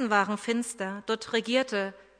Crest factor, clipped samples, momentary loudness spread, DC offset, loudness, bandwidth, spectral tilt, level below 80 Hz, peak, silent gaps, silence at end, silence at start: 20 dB; under 0.1%; 7 LU; under 0.1%; -29 LUFS; 11 kHz; -3.5 dB/octave; -72 dBFS; -10 dBFS; none; 0.2 s; 0 s